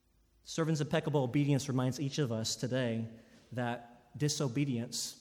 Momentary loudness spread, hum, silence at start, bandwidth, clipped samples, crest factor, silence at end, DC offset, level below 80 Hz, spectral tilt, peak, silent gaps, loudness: 10 LU; none; 0.45 s; 17.5 kHz; under 0.1%; 18 dB; 0 s; under 0.1%; -70 dBFS; -5 dB/octave; -18 dBFS; none; -34 LUFS